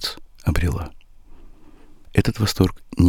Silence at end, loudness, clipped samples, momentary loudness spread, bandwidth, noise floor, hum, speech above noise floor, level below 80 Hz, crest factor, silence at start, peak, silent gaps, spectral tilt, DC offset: 0 s; -23 LUFS; under 0.1%; 9 LU; 18 kHz; -43 dBFS; none; 24 dB; -32 dBFS; 20 dB; 0 s; -2 dBFS; none; -6 dB/octave; under 0.1%